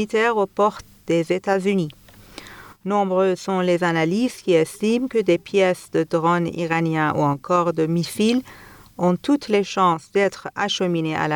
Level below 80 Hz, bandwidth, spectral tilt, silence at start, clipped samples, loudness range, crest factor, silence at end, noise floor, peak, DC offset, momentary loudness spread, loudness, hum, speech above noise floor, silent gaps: -58 dBFS; over 20 kHz; -6 dB/octave; 0 s; under 0.1%; 2 LU; 14 dB; 0 s; -42 dBFS; -6 dBFS; under 0.1%; 5 LU; -21 LUFS; none; 22 dB; none